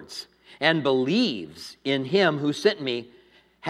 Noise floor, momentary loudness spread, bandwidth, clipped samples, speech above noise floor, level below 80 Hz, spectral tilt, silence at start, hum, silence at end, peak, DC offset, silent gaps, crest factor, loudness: -56 dBFS; 14 LU; 13 kHz; under 0.1%; 32 dB; -70 dBFS; -5 dB/octave; 0 s; none; 0 s; -4 dBFS; under 0.1%; none; 22 dB; -24 LUFS